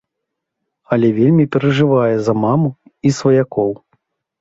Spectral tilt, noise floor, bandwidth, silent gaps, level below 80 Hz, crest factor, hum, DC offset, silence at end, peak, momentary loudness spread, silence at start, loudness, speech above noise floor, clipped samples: -7.5 dB/octave; -78 dBFS; 8 kHz; none; -54 dBFS; 14 dB; none; under 0.1%; 0.65 s; -2 dBFS; 7 LU; 0.9 s; -15 LUFS; 64 dB; under 0.1%